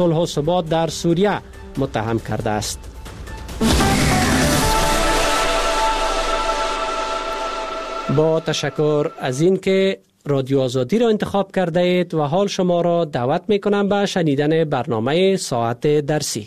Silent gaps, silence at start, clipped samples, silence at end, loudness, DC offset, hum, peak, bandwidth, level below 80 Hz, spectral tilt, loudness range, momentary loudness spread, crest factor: none; 0 s; under 0.1%; 0 s; -19 LUFS; under 0.1%; none; -2 dBFS; 15 kHz; -32 dBFS; -5 dB/octave; 3 LU; 8 LU; 16 dB